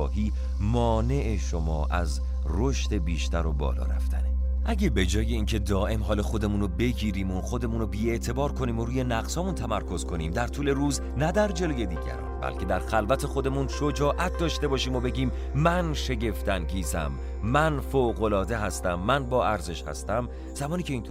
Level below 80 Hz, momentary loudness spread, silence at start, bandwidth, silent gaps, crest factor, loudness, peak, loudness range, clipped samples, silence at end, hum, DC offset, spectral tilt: -30 dBFS; 6 LU; 0 s; 15.5 kHz; none; 16 dB; -28 LUFS; -10 dBFS; 2 LU; under 0.1%; 0 s; none; under 0.1%; -6 dB/octave